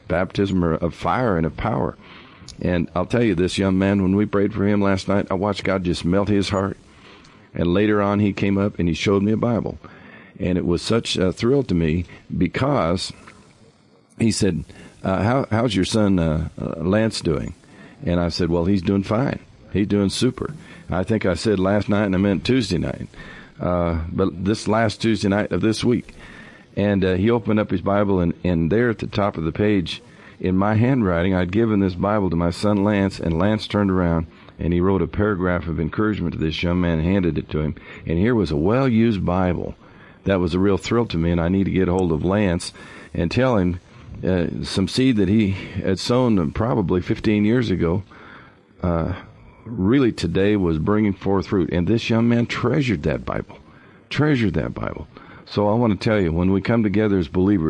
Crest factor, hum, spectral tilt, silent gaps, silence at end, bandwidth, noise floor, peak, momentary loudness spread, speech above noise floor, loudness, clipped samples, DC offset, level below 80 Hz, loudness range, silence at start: 12 dB; none; -7 dB/octave; none; 0 s; 11.5 kHz; -54 dBFS; -8 dBFS; 10 LU; 34 dB; -21 LUFS; under 0.1%; under 0.1%; -44 dBFS; 2 LU; 0.1 s